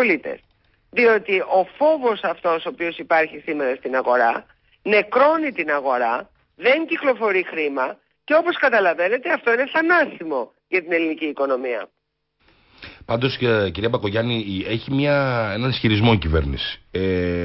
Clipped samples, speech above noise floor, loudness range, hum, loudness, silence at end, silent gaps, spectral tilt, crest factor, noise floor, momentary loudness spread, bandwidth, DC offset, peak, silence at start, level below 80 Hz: under 0.1%; 50 dB; 4 LU; none; -20 LUFS; 0 s; none; -10.5 dB/octave; 14 dB; -70 dBFS; 10 LU; 5.8 kHz; under 0.1%; -6 dBFS; 0 s; -40 dBFS